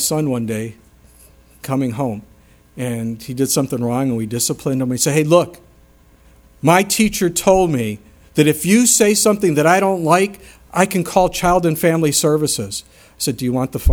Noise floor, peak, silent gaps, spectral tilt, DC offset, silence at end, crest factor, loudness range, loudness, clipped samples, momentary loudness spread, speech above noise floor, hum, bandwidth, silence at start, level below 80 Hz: -49 dBFS; 0 dBFS; none; -4.5 dB/octave; under 0.1%; 0 s; 18 dB; 8 LU; -16 LUFS; under 0.1%; 12 LU; 33 dB; none; over 20 kHz; 0 s; -42 dBFS